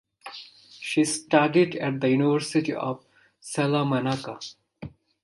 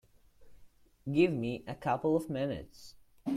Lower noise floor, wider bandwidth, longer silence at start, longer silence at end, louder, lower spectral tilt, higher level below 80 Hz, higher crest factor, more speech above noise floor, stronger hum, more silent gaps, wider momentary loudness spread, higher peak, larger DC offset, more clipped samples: second, -46 dBFS vs -58 dBFS; second, 11.5 kHz vs 14.5 kHz; second, 0.25 s vs 0.4 s; first, 0.35 s vs 0 s; first, -24 LUFS vs -33 LUFS; second, -5 dB/octave vs -7.5 dB/octave; about the same, -64 dBFS vs -62 dBFS; about the same, 22 dB vs 20 dB; second, 22 dB vs 26 dB; neither; neither; first, 21 LU vs 17 LU; first, -4 dBFS vs -14 dBFS; neither; neither